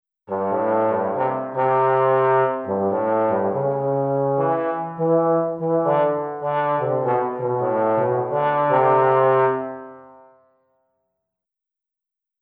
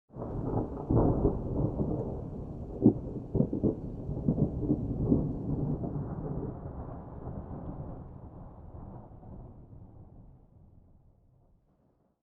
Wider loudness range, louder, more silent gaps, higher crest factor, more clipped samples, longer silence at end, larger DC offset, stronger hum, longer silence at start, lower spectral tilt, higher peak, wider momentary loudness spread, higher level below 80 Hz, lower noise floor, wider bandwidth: second, 2 LU vs 20 LU; first, -20 LUFS vs -33 LUFS; neither; second, 16 dB vs 24 dB; neither; first, 2.35 s vs 1.55 s; neither; neither; first, 0.3 s vs 0.15 s; second, -10.5 dB/octave vs -13.5 dB/octave; first, -4 dBFS vs -8 dBFS; second, 7 LU vs 22 LU; second, -70 dBFS vs -44 dBFS; first, -87 dBFS vs -70 dBFS; first, 4.2 kHz vs 1.9 kHz